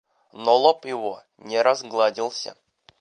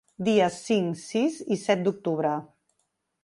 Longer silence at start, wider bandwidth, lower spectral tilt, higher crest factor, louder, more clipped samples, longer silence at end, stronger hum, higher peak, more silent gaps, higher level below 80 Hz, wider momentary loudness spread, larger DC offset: first, 0.35 s vs 0.2 s; second, 10 kHz vs 11.5 kHz; second, -2.5 dB/octave vs -5.5 dB/octave; about the same, 20 dB vs 18 dB; first, -22 LUFS vs -26 LUFS; neither; second, 0.45 s vs 0.8 s; neither; first, -4 dBFS vs -8 dBFS; neither; second, -80 dBFS vs -70 dBFS; first, 14 LU vs 6 LU; neither